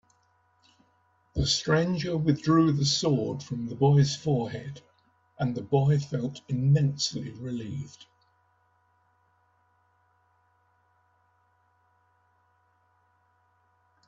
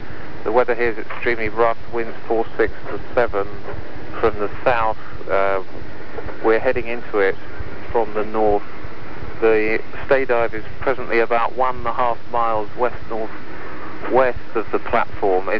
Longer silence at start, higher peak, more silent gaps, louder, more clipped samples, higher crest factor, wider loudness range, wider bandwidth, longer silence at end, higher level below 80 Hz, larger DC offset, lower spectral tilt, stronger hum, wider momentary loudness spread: first, 1.35 s vs 0 s; second, -10 dBFS vs -4 dBFS; neither; second, -27 LUFS vs -21 LUFS; neither; about the same, 20 dB vs 16 dB; first, 12 LU vs 2 LU; first, 7.8 kHz vs 5.4 kHz; first, 6.05 s vs 0 s; second, -54 dBFS vs -42 dBFS; second, under 0.1% vs 10%; second, -6 dB/octave vs -7.5 dB/octave; neither; about the same, 14 LU vs 15 LU